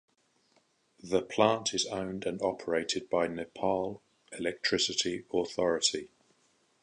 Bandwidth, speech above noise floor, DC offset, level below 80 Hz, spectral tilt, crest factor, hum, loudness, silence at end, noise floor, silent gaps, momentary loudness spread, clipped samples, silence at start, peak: 11 kHz; 39 dB; under 0.1%; -66 dBFS; -3 dB/octave; 24 dB; none; -31 LUFS; 0.75 s; -70 dBFS; none; 9 LU; under 0.1%; 1.05 s; -10 dBFS